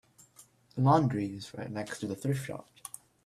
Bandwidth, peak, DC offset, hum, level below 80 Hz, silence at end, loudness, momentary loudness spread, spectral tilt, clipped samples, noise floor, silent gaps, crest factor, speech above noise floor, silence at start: 14 kHz; -10 dBFS; under 0.1%; none; -66 dBFS; 0.65 s; -31 LUFS; 19 LU; -7 dB/octave; under 0.1%; -60 dBFS; none; 22 dB; 30 dB; 0.4 s